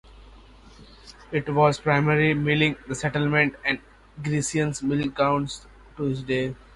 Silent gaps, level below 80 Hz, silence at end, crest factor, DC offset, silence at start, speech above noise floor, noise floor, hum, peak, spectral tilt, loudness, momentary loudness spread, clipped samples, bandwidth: none; -50 dBFS; 0.2 s; 20 dB; under 0.1%; 0.2 s; 25 dB; -49 dBFS; none; -6 dBFS; -5.5 dB/octave; -24 LUFS; 9 LU; under 0.1%; 11.5 kHz